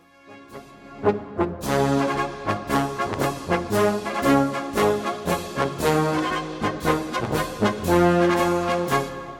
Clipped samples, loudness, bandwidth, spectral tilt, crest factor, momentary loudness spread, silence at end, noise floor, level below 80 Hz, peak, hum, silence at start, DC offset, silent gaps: under 0.1%; -23 LUFS; 17.5 kHz; -5.5 dB/octave; 18 dB; 7 LU; 0 s; -47 dBFS; -46 dBFS; -4 dBFS; none; 0.25 s; under 0.1%; none